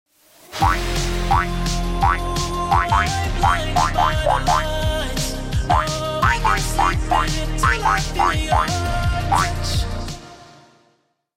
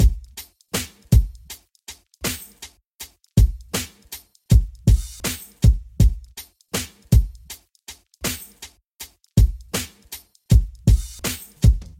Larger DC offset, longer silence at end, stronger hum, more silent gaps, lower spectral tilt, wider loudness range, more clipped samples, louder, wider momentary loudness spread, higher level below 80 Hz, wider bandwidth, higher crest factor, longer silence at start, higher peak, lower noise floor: neither; first, 0.95 s vs 0.15 s; neither; second, none vs 2.87-2.99 s, 8.86-8.97 s; about the same, -4 dB/octave vs -5 dB/octave; second, 1 LU vs 6 LU; neither; about the same, -20 LUFS vs -22 LUFS; second, 6 LU vs 20 LU; about the same, -26 dBFS vs -24 dBFS; about the same, 16.5 kHz vs 17 kHz; about the same, 14 dB vs 18 dB; first, 0.5 s vs 0 s; second, -6 dBFS vs -2 dBFS; first, -63 dBFS vs -45 dBFS